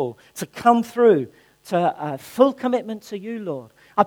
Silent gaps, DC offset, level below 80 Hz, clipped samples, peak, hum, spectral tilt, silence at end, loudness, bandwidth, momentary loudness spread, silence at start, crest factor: none; under 0.1%; -68 dBFS; under 0.1%; 0 dBFS; none; -6 dB/octave; 0 s; -21 LUFS; 19 kHz; 16 LU; 0 s; 20 dB